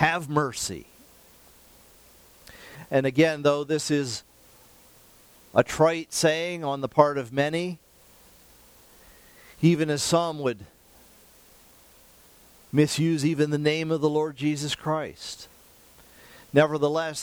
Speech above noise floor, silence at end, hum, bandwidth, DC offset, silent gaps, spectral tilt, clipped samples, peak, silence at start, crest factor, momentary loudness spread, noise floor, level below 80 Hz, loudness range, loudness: 31 dB; 0 s; none; over 20 kHz; under 0.1%; none; -5 dB/octave; under 0.1%; -4 dBFS; 0 s; 24 dB; 14 LU; -55 dBFS; -60 dBFS; 4 LU; -25 LUFS